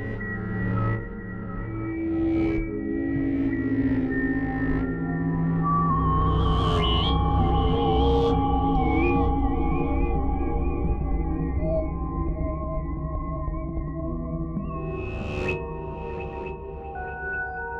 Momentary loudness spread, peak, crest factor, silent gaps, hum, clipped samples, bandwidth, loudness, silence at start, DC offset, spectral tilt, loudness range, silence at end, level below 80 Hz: 10 LU; -12 dBFS; 12 dB; none; none; under 0.1%; 5.8 kHz; -26 LUFS; 0 s; under 0.1%; -8.5 dB/octave; 8 LU; 0 s; -30 dBFS